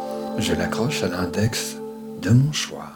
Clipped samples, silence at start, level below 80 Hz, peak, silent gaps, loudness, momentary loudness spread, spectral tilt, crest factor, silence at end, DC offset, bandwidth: under 0.1%; 0 s; -48 dBFS; -6 dBFS; none; -23 LUFS; 11 LU; -5 dB/octave; 18 dB; 0 s; under 0.1%; 19 kHz